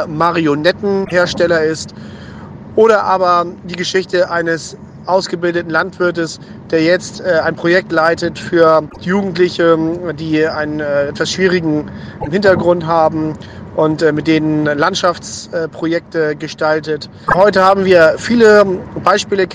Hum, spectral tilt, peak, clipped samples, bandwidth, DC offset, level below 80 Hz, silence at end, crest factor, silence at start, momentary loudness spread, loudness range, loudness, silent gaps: none; -5.5 dB/octave; 0 dBFS; 0.2%; 10 kHz; under 0.1%; -46 dBFS; 0 s; 14 dB; 0 s; 12 LU; 4 LU; -14 LUFS; none